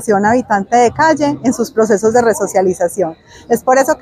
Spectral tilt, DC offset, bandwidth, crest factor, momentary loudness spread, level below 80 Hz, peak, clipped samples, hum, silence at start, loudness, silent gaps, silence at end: -5 dB/octave; under 0.1%; 16 kHz; 12 dB; 6 LU; -50 dBFS; 0 dBFS; under 0.1%; none; 0 s; -13 LUFS; none; 0.05 s